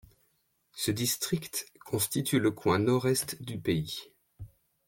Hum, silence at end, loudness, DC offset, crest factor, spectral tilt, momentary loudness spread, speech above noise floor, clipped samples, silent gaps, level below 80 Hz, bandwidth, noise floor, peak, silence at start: none; 0.4 s; -30 LUFS; under 0.1%; 18 dB; -4.5 dB/octave; 22 LU; 44 dB; under 0.1%; none; -62 dBFS; 17 kHz; -73 dBFS; -14 dBFS; 0.75 s